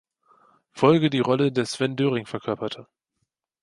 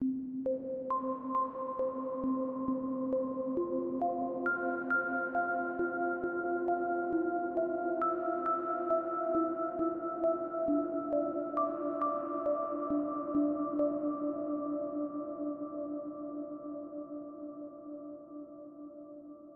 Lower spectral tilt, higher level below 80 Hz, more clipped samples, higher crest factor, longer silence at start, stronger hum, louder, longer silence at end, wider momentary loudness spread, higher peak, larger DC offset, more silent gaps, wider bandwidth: second, -6 dB/octave vs -7.5 dB/octave; first, -64 dBFS vs -70 dBFS; neither; first, 22 dB vs 14 dB; first, 0.75 s vs 0 s; neither; first, -23 LUFS vs -34 LUFS; first, 0.8 s vs 0 s; about the same, 11 LU vs 13 LU; first, -4 dBFS vs -20 dBFS; neither; neither; first, 11.5 kHz vs 3.2 kHz